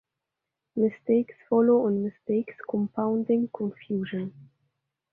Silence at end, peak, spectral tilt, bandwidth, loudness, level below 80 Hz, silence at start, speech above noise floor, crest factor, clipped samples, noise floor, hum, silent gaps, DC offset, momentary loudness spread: 0.7 s; -10 dBFS; -11 dB/octave; 3.5 kHz; -27 LUFS; -72 dBFS; 0.75 s; 60 dB; 16 dB; under 0.1%; -86 dBFS; none; none; under 0.1%; 12 LU